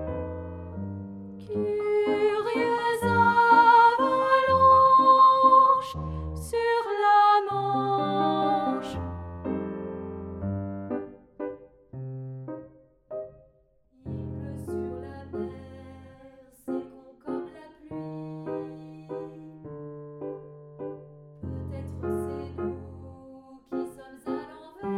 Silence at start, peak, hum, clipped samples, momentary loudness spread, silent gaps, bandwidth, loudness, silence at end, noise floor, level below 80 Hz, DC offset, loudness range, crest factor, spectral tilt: 0 s; -8 dBFS; none; under 0.1%; 24 LU; none; 13.5 kHz; -24 LUFS; 0 s; -63 dBFS; -52 dBFS; under 0.1%; 20 LU; 18 dB; -6.5 dB/octave